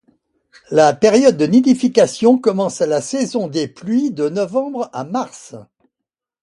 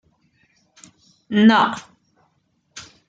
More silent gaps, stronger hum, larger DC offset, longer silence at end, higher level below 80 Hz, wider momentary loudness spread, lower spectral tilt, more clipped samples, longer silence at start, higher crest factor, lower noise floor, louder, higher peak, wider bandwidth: neither; neither; neither; first, 0.8 s vs 0.25 s; first, -60 dBFS vs -68 dBFS; second, 12 LU vs 26 LU; about the same, -5.5 dB/octave vs -5.5 dB/octave; neither; second, 0.7 s vs 1.3 s; about the same, 16 dB vs 20 dB; first, -83 dBFS vs -66 dBFS; about the same, -16 LUFS vs -16 LUFS; about the same, 0 dBFS vs -2 dBFS; first, 11.5 kHz vs 7.8 kHz